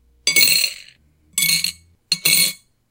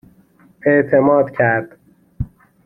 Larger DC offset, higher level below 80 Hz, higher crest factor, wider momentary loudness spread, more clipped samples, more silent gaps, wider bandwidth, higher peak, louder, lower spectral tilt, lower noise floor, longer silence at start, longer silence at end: neither; second, -60 dBFS vs -42 dBFS; about the same, 20 dB vs 16 dB; second, 11 LU vs 17 LU; neither; neither; first, 17 kHz vs 3.8 kHz; about the same, 0 dBFS vs -2 dBFS; about the same, -16 LUFS vs -15 LUFS; second, 1 dB/octave vs -11 dB/octave; about the same, -52 dBFS vs -51 dBFS; second, 0.25 s vs 0.65 s; about the same, 0.35 s vs 0.4 s